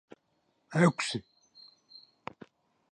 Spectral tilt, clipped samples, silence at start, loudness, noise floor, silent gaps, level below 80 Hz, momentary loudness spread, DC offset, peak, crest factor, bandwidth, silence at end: -5.5 dB/octave; under 0.1%; 0.7 s; -29 LUFS; -75 dBFS; none; -74 dBFS; 21 LU; under 0.1%; -12 dBFS; 22 dB; 11 kHz; 1.7 s